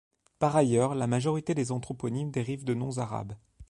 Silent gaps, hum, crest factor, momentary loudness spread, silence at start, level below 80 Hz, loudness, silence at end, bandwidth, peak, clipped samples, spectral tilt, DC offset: none; none; 18 dB; 9 LU; 0.4 s; -60 dBFS; -29 LUFS; 0.05 s; 11.5 kHz; -10 dBFS; under 0.1%; -6.5 dB/octave; under 0.1%